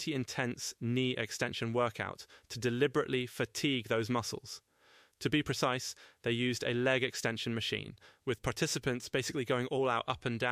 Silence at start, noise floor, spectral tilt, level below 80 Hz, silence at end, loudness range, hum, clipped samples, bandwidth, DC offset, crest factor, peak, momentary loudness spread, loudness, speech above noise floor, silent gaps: 0 s; -65 dBFS; -4.5 dB/octave; -64 dBFS; 0 s; 1 LU; none; under 0.1%; 15.5 kHz; under 0.1%; 18 dB; -16 dBFS; 9 LU; -34 LUFS; 31 dB; none